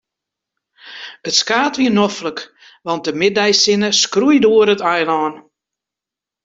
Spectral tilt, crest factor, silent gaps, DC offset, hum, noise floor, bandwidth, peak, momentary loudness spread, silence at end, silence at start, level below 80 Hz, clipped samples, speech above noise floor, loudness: -3 dB/octave; 16 dB; none; under 0.1%; none; -86 dBFS; 7.8 kHz; -2 dBFS; 17 LU; 1.05 s; 0.85 s; -60 dBFS; under 0.1%; 72 dB; -14 LUFS